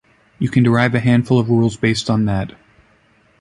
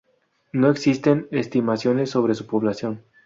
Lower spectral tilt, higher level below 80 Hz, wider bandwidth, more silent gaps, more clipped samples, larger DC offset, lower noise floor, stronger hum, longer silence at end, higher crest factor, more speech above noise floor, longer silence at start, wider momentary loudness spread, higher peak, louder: about the same, -7 dB/octave vs -7 dB/octave; first, -44 dBFS vs -62 dBFS; first, 11 kHz vs 7.8 kHz; neither; neither; neither; second, -55 dBFS vs -66 dBFS; neither; first, 0.9 s vs 0.25 s; about the same, 16 dB vs 18 dB; second, 40 dB vs 46 dB; second, 0.4 s vs 0.55 s; about the same, 8 LU vs 8 LU; about the same, -2 dBFS vs -4 dBFS; first, -16 LUFS vs -22 LUFS